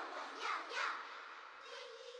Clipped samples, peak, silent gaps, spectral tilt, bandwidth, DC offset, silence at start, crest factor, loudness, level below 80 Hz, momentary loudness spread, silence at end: under 0.1%; -28 dBFS; none; 1.5 dB/octave; 11 kHz; under 0.1%; 0 s; 18 dB; -44 LUFS; under -90 dBFS; 11 LU; 0 s